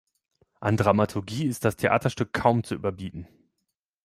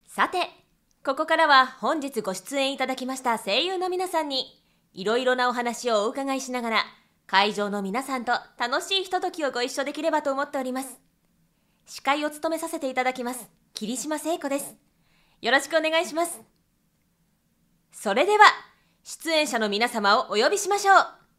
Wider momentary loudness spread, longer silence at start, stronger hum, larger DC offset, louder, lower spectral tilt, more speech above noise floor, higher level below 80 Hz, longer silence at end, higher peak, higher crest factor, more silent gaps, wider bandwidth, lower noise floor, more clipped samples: second, 11 LU vs 14 LU; first, 0.6 s vs 0.1 s; neither; neither; about the same, -25 LUFS vs -24 LUFS; first, -6.5 dB/octave vs -2.5 dB/octave; first, 56 dB vs 44 dB; first, -56 dBFS vs -72 dBFS; first, 0.8 s vs 0.25 s; second, -4 dBFS vs 0 dBFS; about the same, 22 dB vs 26 dB; neither; about the same, 15 kHz vs 16 kHz; first, -81 dBFS vs -69 dBFS; neither